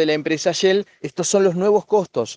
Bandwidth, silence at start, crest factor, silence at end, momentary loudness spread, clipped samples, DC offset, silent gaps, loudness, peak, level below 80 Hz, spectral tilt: 10 kHz; 0 s; 14 dB; 0 s; 5 LU; under 0.1%; under 0.1%; none; -19 LUFS; -4 dBFS; -66 dBFS; -4 dB/octave